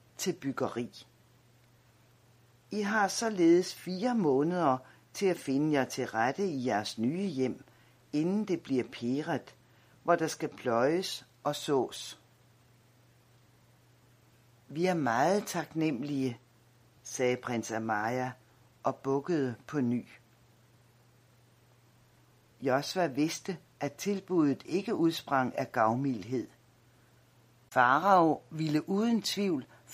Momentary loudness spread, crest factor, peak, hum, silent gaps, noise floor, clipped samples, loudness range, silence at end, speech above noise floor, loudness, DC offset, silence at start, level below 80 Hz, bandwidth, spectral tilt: 10 LU; 22 dB; -10 dBFS; none; none; -63 dBFS; under 0.1%; 7 LU; 0 s; 33 dB; -31 LUFS; under 0.1%; 0.2 s; -76 dBFS; 15.5 kHz; -5 dB/octave